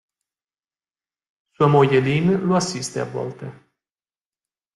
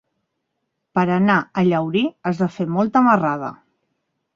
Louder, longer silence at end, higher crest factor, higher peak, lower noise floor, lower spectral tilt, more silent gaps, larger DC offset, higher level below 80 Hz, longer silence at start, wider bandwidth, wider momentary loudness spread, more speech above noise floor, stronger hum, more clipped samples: about the same, -19 LUFS vs -19 LUFS; first, 1.25 s vs 0.85 s; about the same, 20 dB vs 18 dB; about the same, -4 dBFS vs -2 dBFS; first, under -90 dBFS vs -76 dBFS; second, -6 dB/octave vs -8 dB/octave; neither; neither; about the same, -58 dBFS vs -60 dBFS; first, 1.6 s vs 0.95 s; first, 12 kHz vs 7.2 kHz; first, 15 LU vs 8 LU; first, over 71 dB vs 58 dB; neither; neither